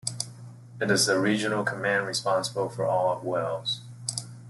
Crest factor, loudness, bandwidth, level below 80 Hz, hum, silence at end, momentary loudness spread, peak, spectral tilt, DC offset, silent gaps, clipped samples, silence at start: 18 dB; -27 LUFS; 12.5 kHz; -68 dBFS; none; 0 s; 10 LU; -8 dBFS; -3.5 dB/octave; under 0.1%; none; under 0.1%; 0.05 s